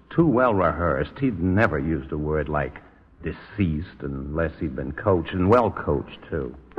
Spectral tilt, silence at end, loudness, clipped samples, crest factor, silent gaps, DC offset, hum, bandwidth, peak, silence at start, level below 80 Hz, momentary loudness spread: -9.5 dB/octave; 0.2 s; -24 LUFS; under 0.1%; 18 dB; none; under 0.1%; none; 6.8 kHz; -6 dBFS; 0.1 s; -40 dBFS; 13 LU